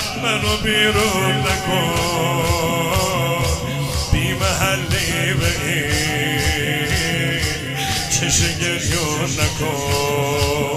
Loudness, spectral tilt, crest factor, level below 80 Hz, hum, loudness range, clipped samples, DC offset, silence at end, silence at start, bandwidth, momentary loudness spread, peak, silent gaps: -18 LUFS; -3.5 dB/octave; 16 dB; -32 dBFS; none; 1 LU; under 0.1%; under 0.1%; 0 s; 0 s; 16 kHz; 4 LU; -2 dBFS; none